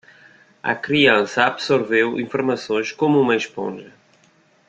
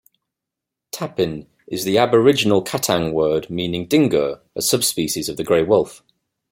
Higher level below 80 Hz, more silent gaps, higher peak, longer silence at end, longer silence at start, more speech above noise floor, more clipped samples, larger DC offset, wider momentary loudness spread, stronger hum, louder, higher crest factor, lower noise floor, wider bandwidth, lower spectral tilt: second, -62 dBFS vs -54 dBFS; neither; about the same, -2 dBFS vs -2 dBFS; first, 0.8 s vs 0.55 s; second, 0.65 s vs 0.95 s; second, 38 dB vs 66 dB; neither; neither; about the same, 13 LU vs 12 LU; neither; about the same, -19 LUFS vs -19 LUFS; about the same, 20 dB vs 18 dB; second, -57 dBFS vs -84 dBFS; second, 8.6 kHz vs 16.5 kHz; about the same, -5 dB/octave vs -4 dB/octave